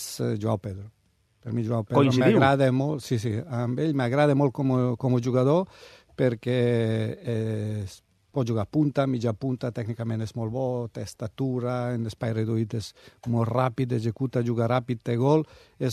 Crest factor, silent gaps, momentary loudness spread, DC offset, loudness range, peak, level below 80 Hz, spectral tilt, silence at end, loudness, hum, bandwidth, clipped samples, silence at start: 20 dB; none; 11 LU; under 0.1%; 6 LU; -6 dBFS; -62 dBFS; -7.5 dB/octave; 0 s; -26 LUFS; none; 13.5 kHz; under 0.1%; 0 s